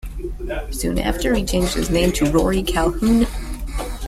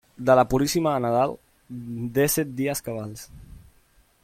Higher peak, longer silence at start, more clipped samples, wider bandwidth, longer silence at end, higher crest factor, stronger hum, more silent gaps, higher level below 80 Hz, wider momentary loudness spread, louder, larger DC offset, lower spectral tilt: about the same, -4 dBFS vs -6 dBFS; second, 0.05 s vs 0.2 s; neither; about the same, 16 kHz vs 16.5 kHz; second, 0 s vs 0.65 s; about the same, 16 dB vs 20 dB; neither; neither; first, -26 dBFS vs -50 dBFS; second, 12 LU vs 22 LU; first, -20 LUFS vs -23 LUFS; neither; about the same, -5 dB/octave vs -5 dB/octave